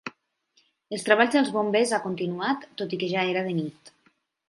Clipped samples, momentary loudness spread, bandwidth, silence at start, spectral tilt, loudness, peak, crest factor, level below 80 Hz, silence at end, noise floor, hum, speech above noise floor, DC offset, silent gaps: under 0.1%; 12 LU; 11.5 kHz; 0.05 s; -4.5 dB/octave; -25 LUFS; -4 dBFS; 22 dB; -76 dBFS; 0.6 s; -68 dBFS; none; 43 dB; under 0.1%; none